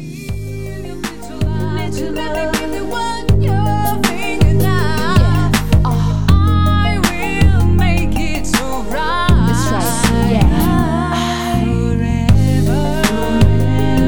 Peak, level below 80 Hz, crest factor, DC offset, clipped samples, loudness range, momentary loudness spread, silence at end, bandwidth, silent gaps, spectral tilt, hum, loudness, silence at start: 0 dBFS; -22 dBFS; 14 dB; 8%; under 0.1%; 4 LU; 8 LU; 0 s; over 20 kHz; none; -6 dB/octave; none; -15 LUFS; 0 s